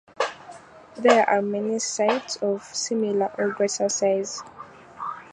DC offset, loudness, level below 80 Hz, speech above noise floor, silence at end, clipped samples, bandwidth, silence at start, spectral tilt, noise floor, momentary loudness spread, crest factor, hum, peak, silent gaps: under 0.1%; -24 LUFS; -70 dBFS; 22 dB; 0.05 s; under 0.1%; 11 kHz; 0.2 s; -3 dB/octave; -45 dBFS; 23 LU; 22 dB; none; -4 dBFS; none